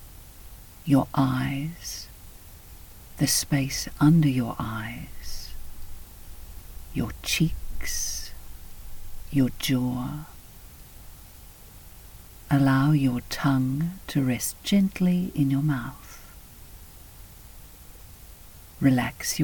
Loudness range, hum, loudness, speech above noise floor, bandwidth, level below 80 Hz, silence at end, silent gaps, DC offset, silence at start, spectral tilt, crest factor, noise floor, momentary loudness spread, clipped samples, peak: 7 LU; none; -25 LUFS; 22 dB; 19 kHz; -42 dBFS; 0 s; none; under 0.1%; 0 s; -5 dB/octave; 20 dB; -46 dBFS; 24 LU; under 0.1%; -8 dBFS